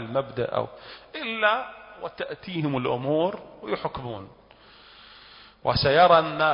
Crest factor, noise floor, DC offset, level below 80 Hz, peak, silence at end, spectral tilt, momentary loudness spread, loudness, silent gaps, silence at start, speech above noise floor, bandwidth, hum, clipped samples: 20 dB; -52 dBFS; under 0.1%; -52 dBFS; -6 dBFS; 0 s; -9.5 dB/octave; 20 LU; -24 LUFS; none; 0 s; 27 dB; 5.6 kHz; none; under 0.1%